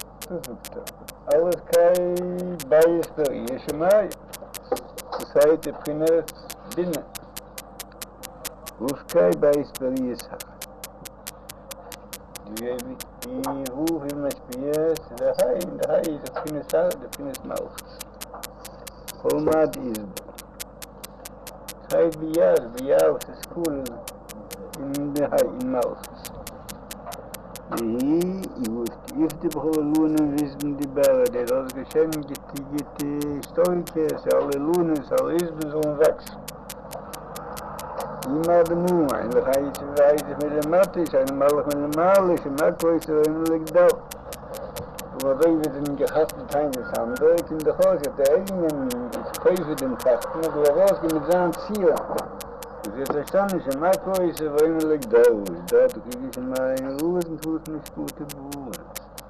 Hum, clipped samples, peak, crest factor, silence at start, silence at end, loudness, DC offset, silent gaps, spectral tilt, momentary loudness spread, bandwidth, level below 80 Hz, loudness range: none; under 0.1%; -6 dBFS; 18 dB; 0 s; 0 s; -23 LUFS; under 0.1%; none; -5.5 dB/octave; 18 LU; 14 kHz; -50 dBFS; 7 LU